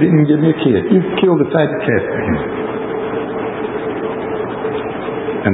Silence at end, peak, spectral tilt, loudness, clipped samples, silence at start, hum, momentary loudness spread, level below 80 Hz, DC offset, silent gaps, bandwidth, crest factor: 0 s; 0 dBFS; -13 dB/octave; -17 LUFS; under 0.1%; 0 s; none; 9 LU; -42 dBFS; under 0.1%; none; 4 kHz; 16 dB